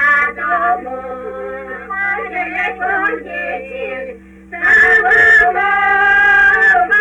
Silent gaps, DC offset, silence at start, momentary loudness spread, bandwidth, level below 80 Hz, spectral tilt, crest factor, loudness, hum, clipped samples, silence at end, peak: none; under 0.1%; 0 s; 18 LU; 10 kHz; -44 dBFS; -3.5 dB/octave; 12 dB; -11 LUFS; none; under 0.1%; 0 s; -2 dBFS